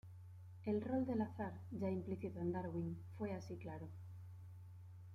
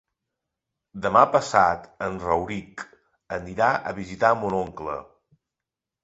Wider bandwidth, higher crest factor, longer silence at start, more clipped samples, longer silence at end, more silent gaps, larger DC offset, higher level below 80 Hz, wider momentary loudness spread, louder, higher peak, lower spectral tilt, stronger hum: first, 12 kHz vs 8.2 kHz; second, 16 dB vs 22 dB; second, 0.05 s vs 0.95 s; neither; second, 0 s vs 1 s; neither; neither; second, -74 dBFS vs -54 dBFS; about the same, 17 LU vs 17 LU; second, -45 LUFS vs -23 LUFS; second, -28 dBFS vs -2 dBFS; first, -9 dB/octave vs -5.5 dB/octave; neither